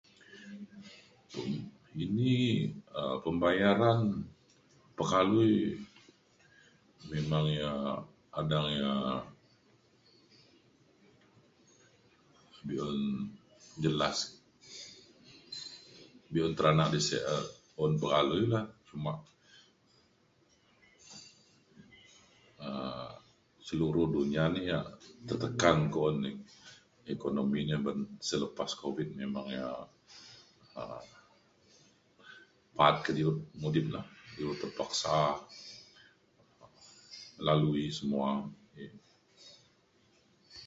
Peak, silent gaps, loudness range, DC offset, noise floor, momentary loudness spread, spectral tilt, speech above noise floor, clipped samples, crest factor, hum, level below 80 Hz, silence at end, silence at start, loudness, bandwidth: -10 dBFS; none; 11 LU; under 0.1%; -69 dBFS; 23 LU; -5.5 dB/octave; 37 dB; under 0.1%; 26 dB; none; -62 dBFS; 0 s; 0.3 s; -33 LUFS; 8 kHz